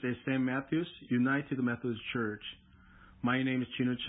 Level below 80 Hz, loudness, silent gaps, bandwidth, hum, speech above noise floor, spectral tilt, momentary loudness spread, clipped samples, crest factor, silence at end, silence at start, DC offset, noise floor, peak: -64 dBFS; -33 LUFS; none; 3.9 kHz; none; 25 dB; -4 dB/octave; 7 LU; under 0.1%; 16 dB; 0 s; 0 s; under 0.1%; -58 dBFS; -18 dBFS